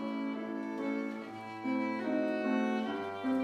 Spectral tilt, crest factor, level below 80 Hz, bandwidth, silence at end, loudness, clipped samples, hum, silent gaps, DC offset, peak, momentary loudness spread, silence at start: -6.5 dB/octave; 14 dB; -86 dBFS; 9.4 kHz; 0 s; -35 LUFS; under 0.1%; none; none; under 0.1%; -20 dBFS; 8 LU; 0 s